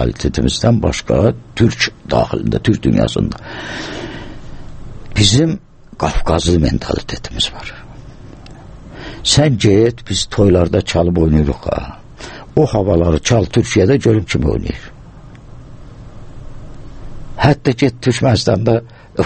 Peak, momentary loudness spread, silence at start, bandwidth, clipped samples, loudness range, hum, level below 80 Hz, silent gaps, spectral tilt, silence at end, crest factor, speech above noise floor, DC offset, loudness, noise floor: 0 dBFS; 21 LU; 0 s; 8.8 kHz; under 0.1%; 5 LU; none; -28 dBFS; none; -5.5 dB/octave; 0 s; 16 dB; 22 dB; under 0.1%; -15 LUFS; -36 dBFS